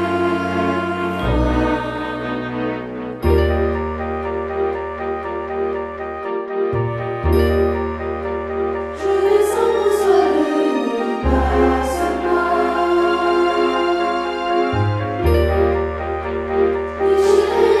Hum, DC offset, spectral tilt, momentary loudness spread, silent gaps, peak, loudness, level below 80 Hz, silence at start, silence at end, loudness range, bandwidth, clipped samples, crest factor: none; under 0.1%; -7 dB/octave; 9 LU; none; -2 dBFS; -19 LUFS; -30 dBFS; 0 s; 0 s; 4 LU; 14 kHz; under 0.1%; 16 dB